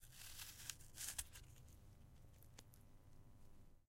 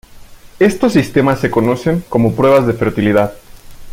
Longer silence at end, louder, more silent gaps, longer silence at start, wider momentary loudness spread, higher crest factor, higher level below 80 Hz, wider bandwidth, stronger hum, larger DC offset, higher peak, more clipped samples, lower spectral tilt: first, 0.15 s vs 0 s; second, -53 LUFS vs -13 LUFS; neither; second, 0 s vs 0.15 s; first, 20 LU vs 5 LU; first, 34 dB vs 14 dB; second, -66 dBFS vs -40 dBFS; about the same, 16 kHz vs 16.5 kHz; neither; neither; second, -24 dBFS vs 0 dBFS; neither; second, -1 dB/octave vs -7 dB/octave